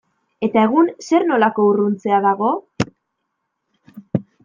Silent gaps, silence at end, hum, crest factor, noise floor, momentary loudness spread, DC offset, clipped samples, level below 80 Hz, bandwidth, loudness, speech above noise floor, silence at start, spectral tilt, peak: none; 0.2 s; none; 16 dB; -75 dBFS; 11 LU; under 0.1%; under 0.1%; -58 dBFS; 7.6 kHz; -18 LUFS; 59 dB; 0.4 s; -7 dB/octave; -2 dBFS